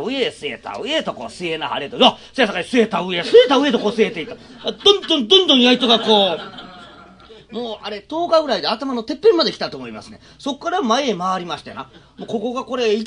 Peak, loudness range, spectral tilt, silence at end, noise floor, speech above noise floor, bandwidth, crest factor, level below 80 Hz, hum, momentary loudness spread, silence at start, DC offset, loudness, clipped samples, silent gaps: 0 dBFS; 6 LU; -4 dB/octave; 0 s; -43 dBFS; 25 dB; 10.5 kHz; 18 dB; -56 dBFS; none; 17 LU; 0 s; under 0.1%; -17 LUFS; under 0.1%; none